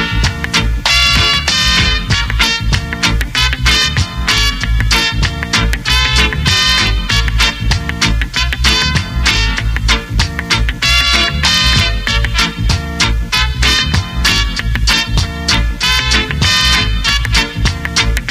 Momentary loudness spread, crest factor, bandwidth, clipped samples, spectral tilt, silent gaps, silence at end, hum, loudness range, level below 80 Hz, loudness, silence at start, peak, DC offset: 6 LU; 12 dB; 16 kHz; under 0.1%; -2.5 dB/octave; none; 0 s; none; 2 LU; -18 dBFS; -12 LUFS; 0 s; 0 dBFS; under 0.1%